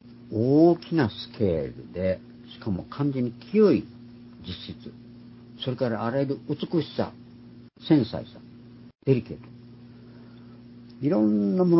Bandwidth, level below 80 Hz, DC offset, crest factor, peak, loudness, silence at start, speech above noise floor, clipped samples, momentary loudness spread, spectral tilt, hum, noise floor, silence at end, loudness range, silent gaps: 5.8 kHz; -54 dBFS; under 0.1%; 18 dB; -8 dBFS; -26 LUFS; 0.05 s; 23 dB; under 0.1%; 26 LU; -11.5 dB/octave; 60 Hz at -50 dBFS; -48 dBFS; 0 s; 5 LU; none